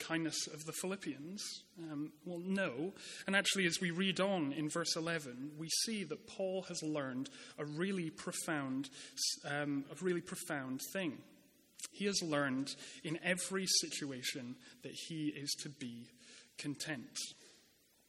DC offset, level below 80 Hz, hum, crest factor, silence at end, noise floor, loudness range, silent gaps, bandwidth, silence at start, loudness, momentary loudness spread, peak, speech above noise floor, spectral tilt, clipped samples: under 0.1%; -82 dBFS; none; 24 dB; 0.5 s; -70 dBFS; 5 LU; none; 16 kHz; 0 s; -39 LUFS; 13 LU; -16 dBFS; 30 dB; -3 dB/octave; under 0.1%